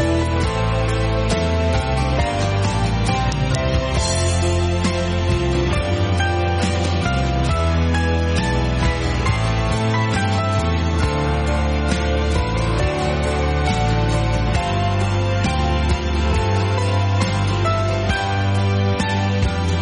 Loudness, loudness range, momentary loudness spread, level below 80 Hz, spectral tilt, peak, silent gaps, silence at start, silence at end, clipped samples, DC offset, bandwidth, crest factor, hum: -19 LUFS; 0 LU; 1 LU; -24 dBFS; -5.5 dB/octave; -6 dBFS; none; 0 s; 0 s; under 0.1%; under 0.1%; 10.5 kHz; 12 dB; none